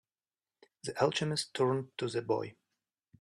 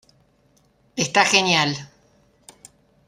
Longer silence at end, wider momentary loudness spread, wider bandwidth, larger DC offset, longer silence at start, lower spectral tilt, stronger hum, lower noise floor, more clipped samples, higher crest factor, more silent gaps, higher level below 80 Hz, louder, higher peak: second, 0.7 s vs 1.2 s; second, 12 LU vs 17 LU; second, 13 kHz vs 14.5 kHz; neither; about the same, 0.85 s vs 0.95 s; first, -5 dB/octave vs -2.5 dB/octave; neither; first, under -90 dBFS vs -61 dBFS; neither; about the same, 22 dB vs 22 dB; neither; second, -74 dBFS vs -64 dBFS; second, -33 LUFS vs -18 LUFS; second, -14 dBFS vs -2 dBFS